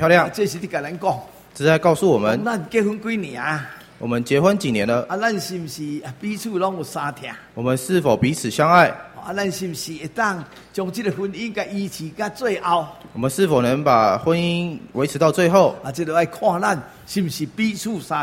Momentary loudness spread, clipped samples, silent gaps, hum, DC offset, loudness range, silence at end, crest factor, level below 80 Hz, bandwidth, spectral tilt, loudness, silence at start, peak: 13 LU; under 0.1%; none; none; under 0.1%; 6 LU; 0 s; 20 dB; -56 dBFS; 16.5 kHz; -5.5 dB/octave; -21 LUFS; 0 s; 0 dBFS